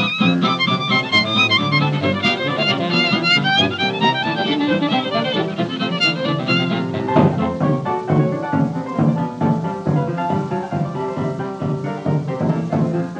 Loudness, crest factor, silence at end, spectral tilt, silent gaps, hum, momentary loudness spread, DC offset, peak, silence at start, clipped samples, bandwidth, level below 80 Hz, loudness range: -18 LUFS; 18 dB; 0 s; -6 dB/octave; none; none; 8 LU; under 0.1%; -2 dBFS; 0 s; under 0.1%; 8.8 kHz; -56 dBFS; 6 LU